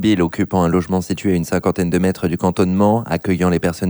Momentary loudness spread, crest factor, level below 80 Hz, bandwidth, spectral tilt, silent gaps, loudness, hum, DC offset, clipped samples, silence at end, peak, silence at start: 3 LU; 14 dB; -42 dBFS; over 20 kHz; -7 dB/octave; none; -17 LUFS; none; under 0.1%; under 0.1%; 0 s; -2 dBFS; 0 s